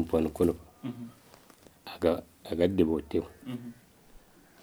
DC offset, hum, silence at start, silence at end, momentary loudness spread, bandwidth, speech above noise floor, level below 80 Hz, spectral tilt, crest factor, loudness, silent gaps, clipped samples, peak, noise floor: under 0.1%; none; 0 s; 0.45 s; 19 LU; over 20 kHz; 28 dB; -54 dBFS; -7.5 dB/octave; 20 dB; -31 LUFS; none; under 0.1%; -12 dBFS; -57 dBFS